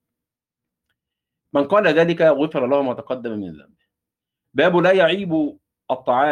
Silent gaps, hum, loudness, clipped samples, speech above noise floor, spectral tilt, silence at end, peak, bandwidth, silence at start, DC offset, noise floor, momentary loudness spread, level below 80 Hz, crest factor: none; none; -19 LUFS; under 0.1%; 68 dB; -7 dB/octave; 0 s; -4 dBFS; 9.2 kHz; 1.55 s; under 0.1%; -86 dBFS; 12 LU; -64 dBFS; 16 dB